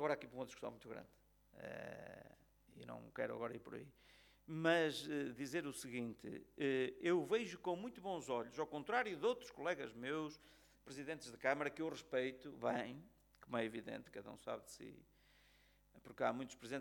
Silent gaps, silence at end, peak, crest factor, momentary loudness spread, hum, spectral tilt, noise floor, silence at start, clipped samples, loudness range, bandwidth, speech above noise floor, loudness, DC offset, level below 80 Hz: none; 0 s; -22 dBFS; 24 dB; 17 LU; 50 Hz at -75 dBFS; -5 dB/octave; -72 dBFS; 0 s; under 0.1%; 10 LU; 19 kHz; 28 dB; -44 LUFS; under 0.1%; -76 dBFS